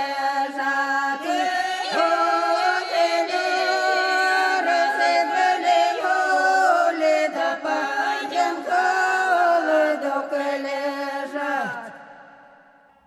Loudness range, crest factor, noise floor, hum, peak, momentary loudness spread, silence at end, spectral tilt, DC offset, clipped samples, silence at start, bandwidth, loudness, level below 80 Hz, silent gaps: 3 LU; 14 dB; -53 dBFS; none; -6 dBFS; 7 LU; 0.8 s; -1.5 dB/octave; under 0.1%; under 0.1%; 0 s; 13.5 kHz; -21 LUFS; -80 dBFS; none